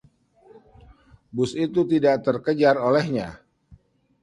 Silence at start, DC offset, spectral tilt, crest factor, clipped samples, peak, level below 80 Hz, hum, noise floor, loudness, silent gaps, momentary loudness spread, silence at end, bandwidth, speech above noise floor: 1.35 s; under 0.1%; -7 dB/octave; 20 dB; under 0.1%; -4 dBFS; -58 dBFS; none; -55 dBFS; -22 LUFS; none; 10 LU; 0.45 s; 11 kHz; 34 dB